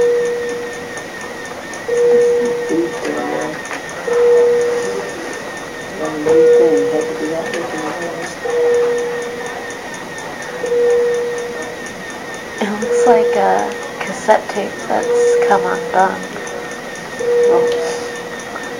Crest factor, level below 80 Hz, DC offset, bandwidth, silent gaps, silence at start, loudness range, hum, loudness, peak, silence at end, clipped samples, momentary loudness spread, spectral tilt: 16 dB; -54 dBFS; 0.2%; 15.5 kHz; none; 0 s; 5 LU; none; -17 LUFS; 0 dBFS; 0 s; under 0.1%; 14 LU; -4 dB/octave